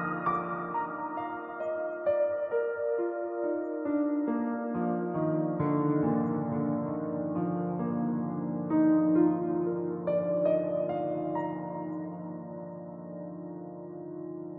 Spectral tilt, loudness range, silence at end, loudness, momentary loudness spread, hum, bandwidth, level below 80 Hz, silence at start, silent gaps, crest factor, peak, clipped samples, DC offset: -12 dB/octave; 5 LU; 0 s; -31 LUFS; 14 LU; none; 3.8 kHz; -72 dBFS; 0 s; none; 16 dB; -14 dBFS; under 0.1%; under 0.1%